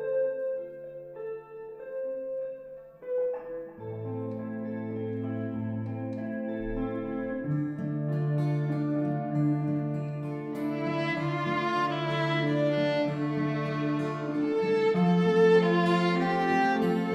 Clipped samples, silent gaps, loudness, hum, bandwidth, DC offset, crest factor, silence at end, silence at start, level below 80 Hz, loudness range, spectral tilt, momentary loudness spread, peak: under 0.1%; none; -29 LUFS; none; 9.6 kHz; under 0.1%; 18 dB; 0 s; 0 s; -56 dBFS; 10 LU; -8 dB/octave; 15 LU; -12 dBFS